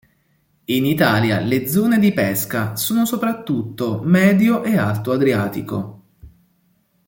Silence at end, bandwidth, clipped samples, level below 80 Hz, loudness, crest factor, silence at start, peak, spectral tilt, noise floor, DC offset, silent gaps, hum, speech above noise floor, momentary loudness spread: 0.8 s; 17 kHz; under 0.1%; -54 dBFS; -18 LUFS; 16 dB; 0.7 s; -2 dBFS; -6 dB/octave; -62 dBFS; under 0.1%; none; none; 45 dB; 9 LU